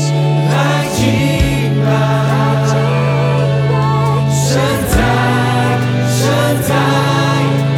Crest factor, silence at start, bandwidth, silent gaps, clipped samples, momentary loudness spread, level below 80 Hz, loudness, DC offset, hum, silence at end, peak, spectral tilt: 12 dB; 0 s; 16 kHz; none; under 0.1%; 1 LU; -30 dBFS; -13 LUFS; under 0.1%; none; 0 s; 0 dBFS; -6 dB/octave